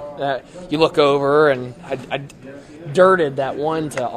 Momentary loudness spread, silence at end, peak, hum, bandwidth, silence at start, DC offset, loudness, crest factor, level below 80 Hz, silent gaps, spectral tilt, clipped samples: 17 LU; 0 s; 0 dBFS; none; 12.5 kHz; 0 s; under 0.1%; -18 LUFS; 18 dB; -54 dBFS; none; -5.5 dB/octave; under 0.1%